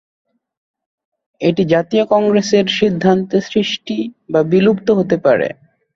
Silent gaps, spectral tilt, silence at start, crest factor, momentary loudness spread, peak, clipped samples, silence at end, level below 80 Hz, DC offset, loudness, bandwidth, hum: none; -6 dB/octave; 1.4 s; 14 dB; 6 LU; -2 dBFS; under 0.1%; 0.45 s; -54 dBFS; under 0.1%; -15 LUFS; 7.6 kHz; none